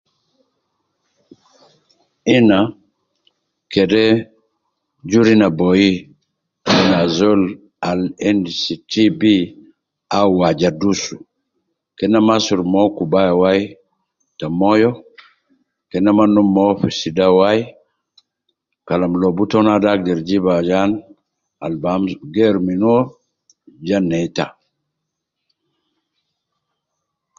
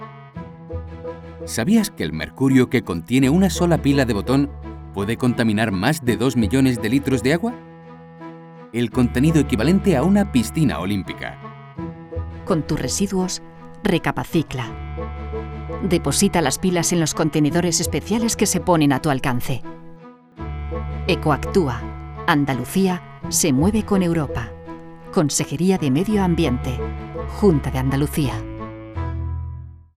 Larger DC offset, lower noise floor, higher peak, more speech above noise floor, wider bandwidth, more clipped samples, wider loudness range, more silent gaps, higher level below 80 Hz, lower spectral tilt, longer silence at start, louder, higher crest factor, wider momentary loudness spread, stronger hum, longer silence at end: neither; first, -78 dBFS vs -42 dBFS; about the same, -2 dBFS vs -4 dBFS; first, 63 dB vs 23 dB; second, 7.4 kHz vs 16.5 kHz; neither; about the same, 5 LU vs 5 LU; neither; second, -50 dBFS vs -36 dBFS; about the same, -6 dB/octave vs -5.5 dB/octave; first, 2.25 s vs 0 s; first, -16 LUFS vs -20 LUFS; about the same, 16 dB vs 18 dB; second, 12 LU vs 16 LU; neither; first, 2.9 s vs 0.25 s